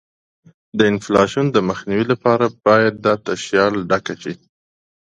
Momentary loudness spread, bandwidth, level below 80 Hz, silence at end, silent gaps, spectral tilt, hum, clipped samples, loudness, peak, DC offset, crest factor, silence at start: 13 LU; 9.2 kHz; -52 dBFS; 0.65 s; none; -5.5 dB/octave; none; under 0.1%; -17 LUFS; 0 dBFS; under 0.1%; 18 dB; 0.75 s